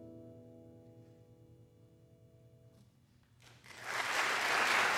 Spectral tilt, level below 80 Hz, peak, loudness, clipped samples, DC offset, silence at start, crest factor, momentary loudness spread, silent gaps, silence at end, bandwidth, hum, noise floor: -1 dB/octave; -76 dBFS; -18 dBFS; -33 LUFS; under 0.1%; under 0.1%; 0 s; 20 dB; 28 LU; none; 0 s; 17 kHz; none; -67 dBFS